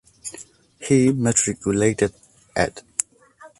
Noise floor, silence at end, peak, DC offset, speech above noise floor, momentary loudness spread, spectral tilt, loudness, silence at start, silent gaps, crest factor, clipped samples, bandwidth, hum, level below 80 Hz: -49 dBFS; 0.1 s; -2 dBFS; under 0.1%; 29 dB; 17 LU; -5 dB/octave; -21 LUFS; 0.25 s; none; 20 dB; under 0.1%; 11.5 kHz; none; -50 dBFS